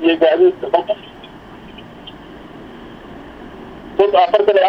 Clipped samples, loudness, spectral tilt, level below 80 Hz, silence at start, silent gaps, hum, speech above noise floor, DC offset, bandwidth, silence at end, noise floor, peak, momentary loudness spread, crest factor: under 0.1%; -15 LUFS; -6.5 dB/octave; -48 dBFS; 0 s; none; none; 24 dB; under 0.1%; 5.8 kHz; 0 s; -37 dBFS; 0 dBFS; 24 LU; 16 dB